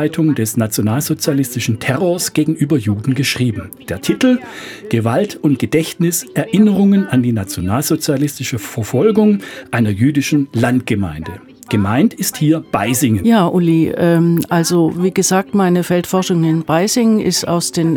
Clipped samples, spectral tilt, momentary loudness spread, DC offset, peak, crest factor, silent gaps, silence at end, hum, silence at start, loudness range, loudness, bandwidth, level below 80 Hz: under 0.1%; -5.5 dB/octave; 7 LU; under 0.1%; 0 dBFS; 14 dB; none; 0 s; none; 0 s; 3 LU; -15 LUFS; 19.5 kHz; -52 dBFS